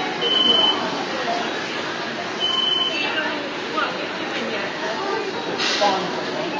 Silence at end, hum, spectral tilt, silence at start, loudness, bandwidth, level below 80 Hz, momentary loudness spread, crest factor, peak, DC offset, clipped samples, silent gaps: 0 s; none; -2.5 dB/octave; 0 s; -21 LUFS; 7.8 kHz; -66 dBFS; 9 LU; 16 dB; -6 dBFS; under 0.1%; under 0.1%; none